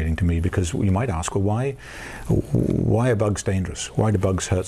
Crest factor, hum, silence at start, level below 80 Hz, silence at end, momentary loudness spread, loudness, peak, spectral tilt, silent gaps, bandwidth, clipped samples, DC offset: 12 dB; none; 0 s; -38 dBFS; 0 s; 6 LU; -22 LUFS; -8 dBFS; -6.5 dB/octave; none; 13 kHz; under 0.1%; under 0.1%